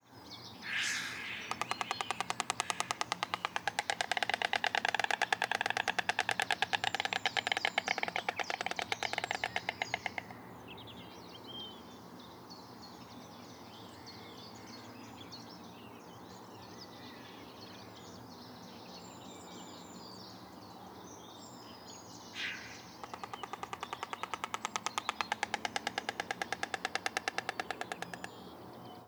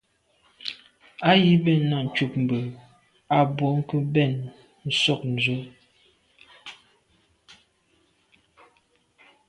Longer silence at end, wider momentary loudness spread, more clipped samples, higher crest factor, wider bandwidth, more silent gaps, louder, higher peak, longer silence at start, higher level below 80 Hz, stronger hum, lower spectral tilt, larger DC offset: second, 0 s vs 2.75 s; second, 18 LU vs 23 LU; neither; first, 32 dB vs 20 dB; first, over 20 kHz vs 11 kHz; neither; second, -36 LUFS vs -23 LUFS; about the same, -8 dBFS vs -6 dBFS; second, 0.05 s vs 0.65 s; second, -76 dBFS vs -64 dBFS; neither; second, -1.5 dB/octave vs -6.5 dB/octave; neither